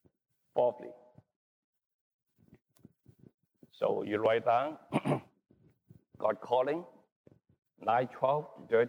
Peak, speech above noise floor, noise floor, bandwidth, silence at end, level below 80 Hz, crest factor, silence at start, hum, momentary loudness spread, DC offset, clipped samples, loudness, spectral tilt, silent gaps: -16 dBFS; 32 dB; -63 dBFS; 10.5 kHz; 0 s; -78 dBFS; 18 dB; 0.55 s; none; 9 LU; under 0.1%; under 0.1%; -32 LUFS; -7 dB/octave; 1.36-1.73 s, 1.86-2.19 s, 3.34-3.38 s, 7.12-7.24 s